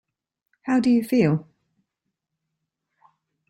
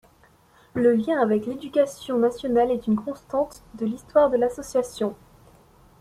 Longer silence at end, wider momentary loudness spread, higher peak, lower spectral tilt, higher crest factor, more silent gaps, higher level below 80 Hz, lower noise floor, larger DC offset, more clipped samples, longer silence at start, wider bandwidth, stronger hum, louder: first, 2.1 s vs 0.85 s; about the same, 9 LU vs 10 LU; about the same, -8 dBFS vs -6 dBFS; first, -7.5 dB/octave vs -6 dB/octave; about the same, 18 dB vs 18 dB; neither; second, -64 dBFS vs -56 dBFS; first, -82 dBFS vs -57 dBFS; neither; neither; about the same, 0.65 s vs 0.75 s; first, 16 kHz vs 13.5 kHz; neither; first, -21 LUFS vs -24 LUFS